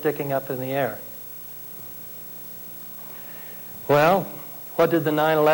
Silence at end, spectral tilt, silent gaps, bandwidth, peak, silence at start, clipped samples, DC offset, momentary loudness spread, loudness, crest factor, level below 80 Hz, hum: 0 s; -6 dB/octave; none; 17 kHz; -10 dBFS; 0 s; under 0.1%; under 0.1%; 15 LU; -25 LUFS; 14 dB; -60 dBFS; 60 Hz at -55 dBFS